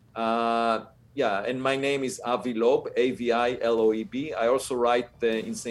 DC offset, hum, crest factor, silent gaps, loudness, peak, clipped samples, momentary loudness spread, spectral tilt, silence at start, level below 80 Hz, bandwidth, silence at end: under 0.1%; none; 16 dB; none; -26 LUFS; -10 dBFS; under 0.1%; 5 LU; -4.5 dB/octave; 0.15 s; -62 dBFS; 12.5 kHz; 0 s